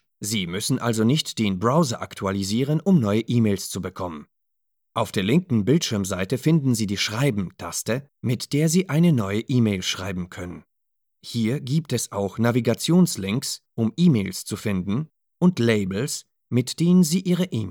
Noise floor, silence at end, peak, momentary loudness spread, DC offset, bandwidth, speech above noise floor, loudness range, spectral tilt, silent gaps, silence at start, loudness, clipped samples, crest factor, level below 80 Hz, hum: -80 dBFS; 0 s; -6 dBFS; 10 LU; under 0.1%; 17.5 kHz; 58 dB; 2 LU; -5.5 dB/octave; none; 0.2 s; -23 LUFS; under 0.1%; 16 dB; -62 dBFS; none